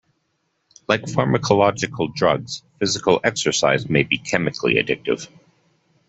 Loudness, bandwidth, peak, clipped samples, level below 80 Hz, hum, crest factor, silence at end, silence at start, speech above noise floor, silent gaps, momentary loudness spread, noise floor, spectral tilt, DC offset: -20 LUFS; 8.4 kHz; -2 dBFS; under 0.1%; -54 dBFS; none; 20 dB; 0.85 s; 0.9 s; 51 dB; none; 8 LU; -71 dBFS; -4.5 dB/octave; under 0.1%